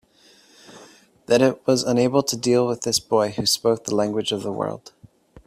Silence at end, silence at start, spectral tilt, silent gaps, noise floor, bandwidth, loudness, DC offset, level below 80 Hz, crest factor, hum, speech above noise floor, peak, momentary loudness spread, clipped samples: 0.7 s; 0.7 s; -4 dB/octave; none; -55 dBFS; 16 kHz; -21 LUFS; under 0.1%; -60 dBFS; 18 dB; none; 34 dB; -4 dBFS; 7 LU; under 0.1%